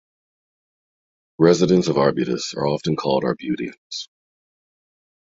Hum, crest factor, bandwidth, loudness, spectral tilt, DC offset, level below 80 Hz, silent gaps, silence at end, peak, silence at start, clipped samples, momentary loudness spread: none; 22 dB; 7.8 kHz; -20 LUFS; -6 dB/octave; under 0.1%; -58 dBFS; 3.78-3.90 s; 1.15 s; -2 dBFS; 1.4 s; under 0.1%; 15 LU